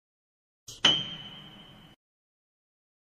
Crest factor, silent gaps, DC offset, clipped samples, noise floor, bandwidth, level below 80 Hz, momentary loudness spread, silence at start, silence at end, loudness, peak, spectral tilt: 28 dB; none; under 0.1%; under 0.1%; -51 dBFS; 15.5 kHz; -66 dBFS; 24 LU; 0.7 s; 1.45 s; -25 LUFS; -6 dBFS; -1.5 dB/octave